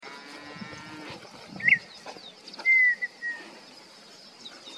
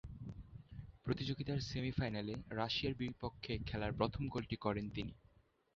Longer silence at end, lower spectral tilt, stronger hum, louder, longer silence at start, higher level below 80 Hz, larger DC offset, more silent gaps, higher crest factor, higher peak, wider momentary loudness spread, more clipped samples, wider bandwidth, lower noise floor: second, 0 s vs 0.6 s; second, -2.5 dB/octave vs -5 dB/octave; neither; first, -23 LUFS vs -42 LUFS; about the same, 0.05 s vs 0.05 s; second, -74 dBFS vs -56 dBFS; neither; neither; about the same, 20 dB vs 22 dB; first, -10 dBFS vs -20 dBFS; first, 26 LU vs 13 LU; neither; first, 12.5 kHz vs 7.4 kHz; second, -50 dBFS vs -71 dBFS